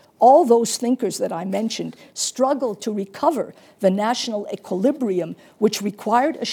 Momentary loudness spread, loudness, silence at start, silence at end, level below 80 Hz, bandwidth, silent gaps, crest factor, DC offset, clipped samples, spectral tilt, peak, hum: 13 LU; -21 LUFS; 0.2 s; 0 s; -78 dBFS; 19 kHz; none; 18 dB; under 0.1%; under 0.1%; -4.5 dB/octave; -2 dBFS; none